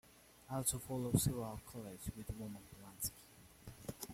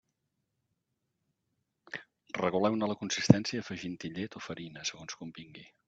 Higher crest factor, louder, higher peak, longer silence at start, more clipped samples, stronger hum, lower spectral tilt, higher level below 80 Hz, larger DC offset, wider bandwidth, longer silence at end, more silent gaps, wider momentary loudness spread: second, 24 dB vs 32 dB; second, -42 LUFS vs -32 LUFS; second, -18 dBFS vs -2 dBFS; second, 0.05 s vs 1.9 s; neither; neither; about the same, -5 dB/octave vs -5.5 dB/octave; first, -58 dBFS vs -68 dBFS; neither; first, 16.5 kHz vs 8 kHz; second, 0 s vs 0.25 s; neither; first, 22 LU vs 19 LU